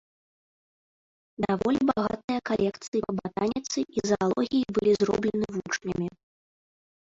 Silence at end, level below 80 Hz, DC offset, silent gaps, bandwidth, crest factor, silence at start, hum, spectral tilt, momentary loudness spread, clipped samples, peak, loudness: 0.95 s; -58 dBFS; under 0.1%; 2.24-2.28 s, 2.88-2.92 s; 7.8 kHz; 18 dB; 1.4 s; none; -5.5 dB/octave; 7 LU; under 0.1%; -10 dBFS; -27 LUFS